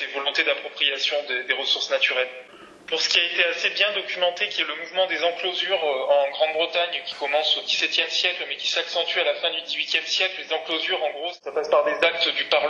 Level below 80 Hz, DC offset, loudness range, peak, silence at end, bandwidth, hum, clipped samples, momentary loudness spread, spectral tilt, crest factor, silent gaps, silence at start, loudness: -74 dBFS; under 0.1%; 1 LU; -4 dBFS; 0 s; 8.4 kHz; none; under 0.1%; 6 LU; 0 dB/octave; 20 dB; none; 0 s; -22 LUFS